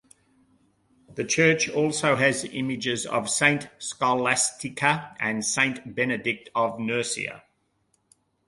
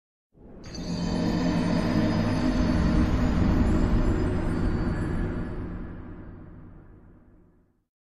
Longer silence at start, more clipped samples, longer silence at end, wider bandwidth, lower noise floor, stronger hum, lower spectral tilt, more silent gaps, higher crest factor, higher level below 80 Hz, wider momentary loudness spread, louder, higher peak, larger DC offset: first, 1.1 s vs 0.3 s; neither; first, 1.1 s vs 0.1 s; about the same, 11.5 kHz vs 11.5 kHz; first, -70 dBFS vs -61 dBFS; neither; second, -3 dB/octave vs -7.5 dB/octave; neither; first, 22 dB vs 16 dB; second, -66 dBFS vs -32 dBFS; second, 8 LU vs 18 LU; about the same, -24 LUFS vs -26 LUFS; first, -4 dBFS vs -10 dBFS; second, under 0.1% vs 0.5%